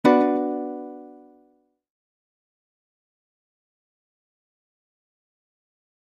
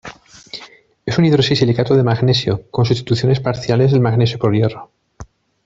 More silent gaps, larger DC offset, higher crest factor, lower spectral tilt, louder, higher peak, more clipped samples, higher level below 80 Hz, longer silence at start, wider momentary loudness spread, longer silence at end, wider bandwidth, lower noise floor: neither; neither; first, 24 dB vs 14 dB; about the same, -6.5 dB/octave vs -7 dB/octave; second, -23 LUFS vs -15 LUFS; about the same, -4 dBFS vs -2 dBFS; neither; second, -76 dBFS vs -46 dBFS; about the same, 0.05 s vs 0.05 s; about the same, 21 LU vs 19 LU; first, 4.9 s vs 0.4 s; first, 9.4 kHz vs 7.6 kHz; first, -64 dBFS vs -42 dBFS